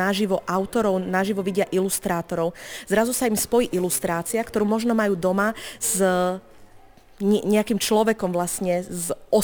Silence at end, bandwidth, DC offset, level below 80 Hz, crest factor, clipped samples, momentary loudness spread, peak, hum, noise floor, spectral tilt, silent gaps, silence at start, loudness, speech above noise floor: 0 s; over 20 kHz; under 0.1%; -52 dBFS; 16 dB; under 0.1%; 6 LU; -6 dBFS; none; -49 dBFS; -4.5 dB/octave; none; 0 s; -23 LUFS; 26 dB